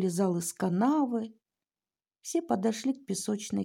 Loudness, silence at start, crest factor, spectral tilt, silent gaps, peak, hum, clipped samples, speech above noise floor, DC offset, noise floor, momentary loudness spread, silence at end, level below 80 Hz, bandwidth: -30 LUFS; 0 s; 16 dB; -5.5 dB/octave; none; -16 dBFS; none; under 0.1%; over 60 dB; under 0.1%; under -90 dBFS; 8 LU; 0 s; -78 dBFS; 17 kHz